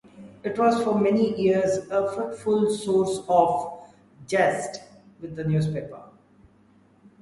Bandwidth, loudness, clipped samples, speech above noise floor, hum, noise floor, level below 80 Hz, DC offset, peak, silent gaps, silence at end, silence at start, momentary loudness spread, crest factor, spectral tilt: 11.5 kHz; -24 LUFS; under 0.1%; 35 dB; none; -58 dBFS; -60 dBFS; under 0.1%; -6 dBFS; none; 1.15 s; 0.15 s; 17 LU; 20 dB; -6.5 dB/octave